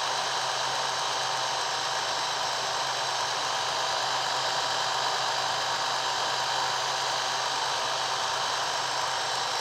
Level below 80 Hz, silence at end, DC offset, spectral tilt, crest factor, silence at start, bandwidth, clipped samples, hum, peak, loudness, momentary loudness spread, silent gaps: -70 dBFS; 0 s; under 0.1%; 0 dB/octave; 14 dB; 0 s; 16 kHz; under 0.1%; none; -14 dBFS; -27 LUFS; 1 LU; none